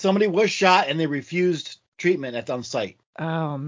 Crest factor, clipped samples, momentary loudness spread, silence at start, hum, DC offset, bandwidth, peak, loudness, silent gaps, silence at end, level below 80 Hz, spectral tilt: 20 dB; under 0.1%; 12 LU; 0 s; none; under 0.1%; 7.6 kHz; -2 dBFS; -23 LUFS; 1.88-1.92 s, 3.06-3.13 s; 0 s; -68 dBFS; -5 dB/octave